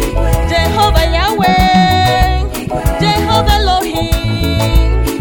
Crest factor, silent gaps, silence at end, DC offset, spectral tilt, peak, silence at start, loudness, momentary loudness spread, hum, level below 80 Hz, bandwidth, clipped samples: 12 dB; none; 0 s; under 0.1%; -5 dB/octave; 0 dBFS; 0 s; -12 LUFS; 6 LU; none; -16 dBFS; 17.5 kHz; under 0.1%